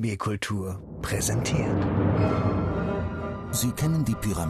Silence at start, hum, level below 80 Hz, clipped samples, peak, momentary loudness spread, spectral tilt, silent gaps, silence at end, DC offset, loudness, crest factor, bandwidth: 0 s; none; -42 dBFS; under 0.1%; -12 dBFS; 8 LU; -5.5 dB/octave; none; 0 s; under 0.1%; -27 LUFS; 14 dB; 14 kHz